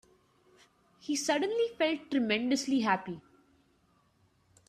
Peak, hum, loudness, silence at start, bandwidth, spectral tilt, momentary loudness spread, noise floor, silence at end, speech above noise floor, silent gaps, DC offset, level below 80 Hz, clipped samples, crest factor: -14 dBFS; none; -30 LUFS; 1.05 s; 14.5 kHz; -3.5 dB/octave; 12 LU; -69 dBFS; 1.5 s; 39 dB; none; under 0.1%; -74 dBFS; under 0.1%; 20 dB